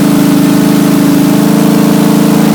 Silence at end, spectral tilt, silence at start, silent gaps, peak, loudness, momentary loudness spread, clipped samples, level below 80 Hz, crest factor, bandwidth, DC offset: 0 s; -6 dB/octave; 0 s; none; 0 dBFS; -7 LUFS; 0 LU; 0.4%; -42 dBFS; 6 dB; 20 kHz; under 0.1%